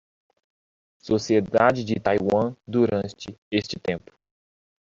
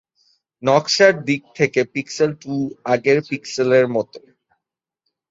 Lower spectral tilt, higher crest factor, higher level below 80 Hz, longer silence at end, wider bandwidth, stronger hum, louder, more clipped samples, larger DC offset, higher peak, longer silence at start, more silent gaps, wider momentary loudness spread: first, -6 dB/octave vs -4.5 dB/octave; about the same, 22 dB vs 18 dB; first, -58 dBFS vs -64 dBFS; second, 0.85 s vs 1.15 s; about the same, 7.6 kHz vs 8 kHz; neither; second, -24 LUFS vs -18 LUFS; neither; neither; about the same, -4 dBFS vs -2 dBFS; first, 1.05 s vs 0.6 s; first, 3.38-3.51 s vs none; about the same, 10 LU vs 11 LU